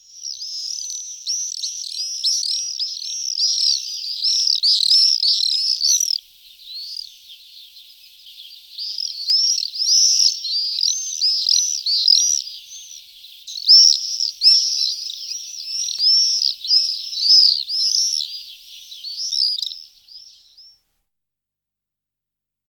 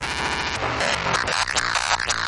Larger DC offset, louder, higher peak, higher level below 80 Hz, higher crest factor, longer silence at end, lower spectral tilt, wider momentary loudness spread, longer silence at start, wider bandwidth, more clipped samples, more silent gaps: neither; first, -15 LUFS vs -22 LUFS; about the same, -2 dBFS vs -4 dBFS; second, -72 dBFS vs -42 dBFS; about the same, 20 dB vs 18 dB; first, 2.05 s vs 0 s; second, 7.5 dB/octave vs -1.5 dB/octave; first, 18 LU vs 3 LU; first, 0.15 s vs 0 s; first, 19 kHz vs 11.5 kHz; neither; neither